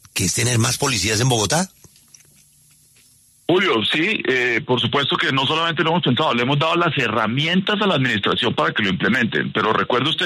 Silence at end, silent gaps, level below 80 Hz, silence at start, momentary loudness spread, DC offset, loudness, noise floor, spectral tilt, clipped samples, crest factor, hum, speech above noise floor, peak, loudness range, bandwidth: 0 s; none; -54 dBFS; 0.15 s; 2 LU; under 0.1%; -18 LUFS; -54 dBFS; -3.5 dB/octave; under 0.1%; 14 dB; none; 35 dB; -6 dBFS; 3 LU; 13.5 kHz